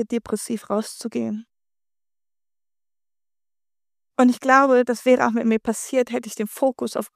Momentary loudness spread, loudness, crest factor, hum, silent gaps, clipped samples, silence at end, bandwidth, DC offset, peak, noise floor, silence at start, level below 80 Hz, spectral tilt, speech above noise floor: 13 LU; -21 LUFS; 22 dB; none; none; under 0.1%; 0.1 s; 15.5 kHz; under 0.1%; 0 dBFS; under -90 dBFS; 0 s; -66 dBFS; -4.5 dB/octave; over 69 dB